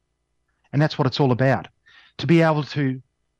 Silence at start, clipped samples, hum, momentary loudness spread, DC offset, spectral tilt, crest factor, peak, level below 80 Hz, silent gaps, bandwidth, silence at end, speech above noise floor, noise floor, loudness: 0.75 s; under 0.1%; none; 10 LU; under 0.1%; -7.5 dB/octave; 16 dB; -6 dBFS; -62 dBFS; none; 8 kHz; 0.4 s; 52 dB; -72 dBFS; -21 LUFS